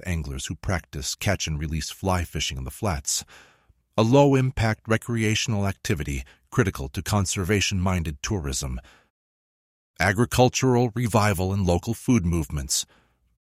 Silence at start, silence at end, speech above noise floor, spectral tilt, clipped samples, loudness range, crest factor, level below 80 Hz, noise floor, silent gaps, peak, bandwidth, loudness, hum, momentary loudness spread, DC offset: 0.05 s; 0.6 s; over 66 dB; -5 dB/octave; under 0.1%; 4 LU; 20 dB; -40 dBFS; under -90 dBFS; 9.10-9.94 s; -4 dBFS; 16 kHz; -24 LUFS; none; 10 LU; under 0.1%